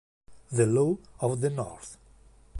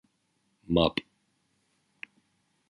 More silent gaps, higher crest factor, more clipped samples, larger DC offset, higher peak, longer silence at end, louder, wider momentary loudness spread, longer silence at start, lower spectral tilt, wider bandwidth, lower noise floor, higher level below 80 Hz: neither; second, 18 dB vs 26 dB; neither; neither; second, -12 dBFS vs -8 dBFS; second, 0 s vs 1.7 s; about the same, -28 LUFS vs -28 LUFS; second, 17 LU vs 22 LU; second, 0.3 s vs 0.7 s; about the same, -7 dB/octave vs -7.5 dB/octave; about the same, 11.5 kHz vs 11 kHz; second, -56 dBFS vs -74 dBFS; second, -58 dBFS vs -52 dBFS